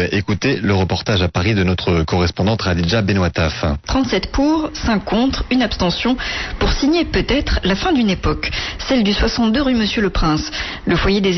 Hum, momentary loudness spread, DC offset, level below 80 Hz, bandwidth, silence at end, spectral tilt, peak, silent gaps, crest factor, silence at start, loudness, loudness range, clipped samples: none; 4 LU; under 0.1%; -28 dBFS; 6.2 kHz; 0 s; -5.5 dB/octave; -6 dBFS; none; 10 dB; 0 s; -17 LUFS; 1 LU; under 0.1%